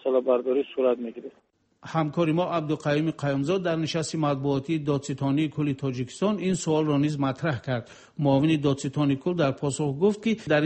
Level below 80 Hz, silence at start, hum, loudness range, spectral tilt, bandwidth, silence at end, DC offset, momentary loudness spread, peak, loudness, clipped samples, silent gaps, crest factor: -60 dBFS; 0.05 s; none; 2 LU; -6.5 dB/octave; 8.8 kHz; 0 s; under 0.1%; 7 LU; -10 dBFS; -26 LUFS; under 0.1%; none; 16 dB